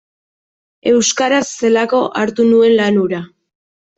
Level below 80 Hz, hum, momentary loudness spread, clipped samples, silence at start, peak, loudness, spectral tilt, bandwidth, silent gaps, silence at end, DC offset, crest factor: -60 dBFS; none; 8 LU; under 0.1%; 0.85 s; -2 dBFS; -14 LUFS; -4 dB/octave; 8.2 kHz; none; 0.7 s; under 0.1%; 12 dB